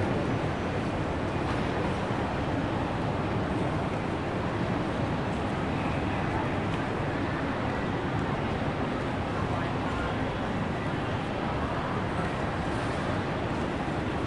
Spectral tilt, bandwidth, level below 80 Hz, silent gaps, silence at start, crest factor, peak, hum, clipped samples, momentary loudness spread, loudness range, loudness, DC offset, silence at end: -7 dB/octave; 11.5 kHz; -44 dBFS; none; 0 s; 14 dB; -16 dBFS; none; under 0.1%; 1 LU; 1 LU; -30 LUFS; 0.2%; 0 s